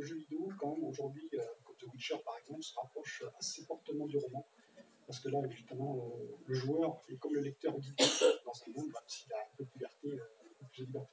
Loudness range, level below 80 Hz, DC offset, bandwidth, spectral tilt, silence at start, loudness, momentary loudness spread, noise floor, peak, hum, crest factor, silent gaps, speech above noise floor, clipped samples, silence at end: 8 LU; under -90 dBFS; under 0.1%; 8 kHz; -4 dB/octave; 0 s; -40 LUFS; 15 LU; -63 dBFS; -16 dBFS; none; 24 dB; none; 24 dB; under 0.1%; 0.05 s